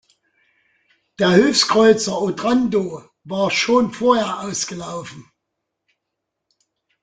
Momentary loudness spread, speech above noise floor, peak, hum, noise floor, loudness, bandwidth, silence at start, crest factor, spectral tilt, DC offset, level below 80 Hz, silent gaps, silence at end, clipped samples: 16 LU; 62 dB; -2 dBFS; none; -79 dBFS; -18 LUFS; 9.4 kHz; 1.2 s; 18 dB; -4 dB/octave; under 0.1%; -58 dBFS; none; 1.8 s; under 0.1%